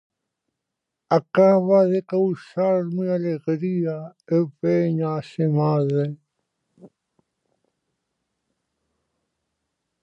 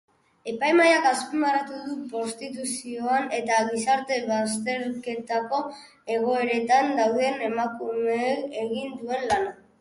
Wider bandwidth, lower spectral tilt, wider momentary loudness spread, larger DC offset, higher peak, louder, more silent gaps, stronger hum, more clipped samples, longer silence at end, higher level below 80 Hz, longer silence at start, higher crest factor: second, 7.8 kHz vs 11.5 kHz; first, -9.5 dB/octave vs -3 dB/octave; about the same, 9 LU vs 11 LU; neither; about the same, -4 dBFS vs -6 dBFS; first, -21 LUFS vs -25 LUFS; neither; neither; neither; first, 3.15 s vs 0.25 s; second, -74 dBFS vs -66 dBFS; first, 1.1 s vs 0.45 s; about the same, 20 dB vs 18 dB